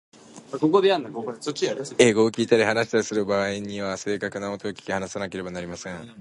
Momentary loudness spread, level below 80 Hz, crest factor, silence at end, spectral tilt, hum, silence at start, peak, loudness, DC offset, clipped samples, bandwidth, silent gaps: 14 LU; -60 dBFS; 22 dB; 0 s; -4.5 dB/octave; none; 0.3 s; -2 dBFS; -24 LUFS; under 0.1%; under 0.1%; 11.5 kHz; none